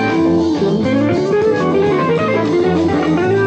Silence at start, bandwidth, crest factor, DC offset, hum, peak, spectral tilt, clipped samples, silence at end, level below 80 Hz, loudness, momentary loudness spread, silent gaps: 0 s; 8.6 kHz; 10 dB; under 0.1%; none; -4 dBFS; -7.5 dB/octave; under 0.1%; 0 s; -44 dBFS; -14 LUFS; 1 LU; none